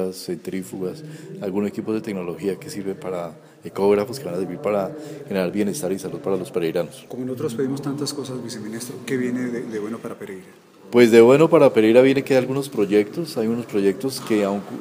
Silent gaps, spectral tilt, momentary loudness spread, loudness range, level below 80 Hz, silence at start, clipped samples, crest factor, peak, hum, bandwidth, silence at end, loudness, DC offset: none; -6 dB/octave; 17 LU; 11 LU; -66 dBFS; 0 s; under 0.1%; 20 dB; 0 dBFS; none; 15.5 kHz; 0 s; -21 LUFS; under 0.1%